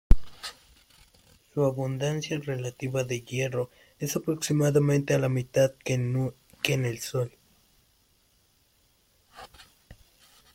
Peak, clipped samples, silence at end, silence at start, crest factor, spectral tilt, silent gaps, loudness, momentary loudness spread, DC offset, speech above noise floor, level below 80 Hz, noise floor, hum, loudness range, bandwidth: -2 dBFS; under 0.1%; 0.6 s; 0.1 s; 26 dB; -5.5 dB/octave; none; -28 LUFS; 14 LU; under 0.1%; 39 dB; -36 dBFS; -66 dBFS; none; 8 LU; 16.5 kHz